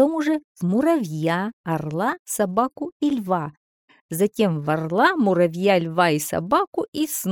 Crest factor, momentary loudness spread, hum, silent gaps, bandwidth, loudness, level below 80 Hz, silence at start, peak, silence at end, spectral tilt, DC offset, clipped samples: 18 dB; 7 LU; none; 0.44-0.55 s, 1.53-1.64 s, 2.19-2.25 s, 2.92-3.00 s, 3.57-3.88 s, 4.01-4.09 s, 6.67-6.72 s, 6.88-6.93 s; 19 kHz; -22 LUFS; -62 dBFS; 0 s; -4 dBFS; 0 s; -5.5 dB/octave; under 0.1%; under 0.1%